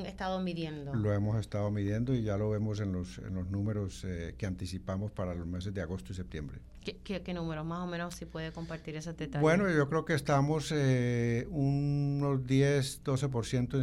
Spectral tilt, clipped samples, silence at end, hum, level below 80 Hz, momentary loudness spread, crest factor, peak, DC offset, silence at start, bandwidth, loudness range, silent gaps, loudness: -6.5 dB/octave; under 0.1%; 0 s; none; -50 dBFS; 12 LU; 16 dB; -16 dBFS; under 0.1%; 0 s; 13 kHz; 9 LU; none; -33 LUFS